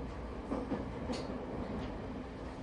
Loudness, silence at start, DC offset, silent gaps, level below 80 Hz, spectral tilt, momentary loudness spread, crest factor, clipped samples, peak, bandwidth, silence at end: -41 LUFS; 0 s; under 0.1%; none; -48 dBFS; -7 dB/octave; 5 LU; 16 dB; under 0.1%; -24 dBFS; 11.5 kHz; 0 s